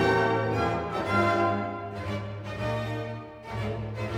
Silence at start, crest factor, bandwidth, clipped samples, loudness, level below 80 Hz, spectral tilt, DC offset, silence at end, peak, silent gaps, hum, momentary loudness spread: 0 s; 18 dB; 13 kHz; under 0.1%; -29 LUFS; -50 dBFS; -7 dB/octave; under 0.1%; 0 s; -10 dBFS; none; none; 11 LU